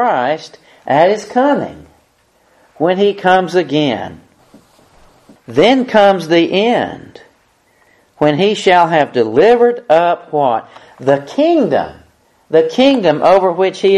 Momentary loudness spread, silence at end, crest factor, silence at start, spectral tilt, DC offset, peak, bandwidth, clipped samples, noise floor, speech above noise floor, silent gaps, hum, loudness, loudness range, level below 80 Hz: 9 LU; 0 s; 14 dB; 0 s; -5.5 dB/octave; under 0.1%; 0 dBFS; 12 kHz; under 0.1%; -55 dBFS; 43 dB; none; none; -13 LUFS; 4 LU; -54 dBFS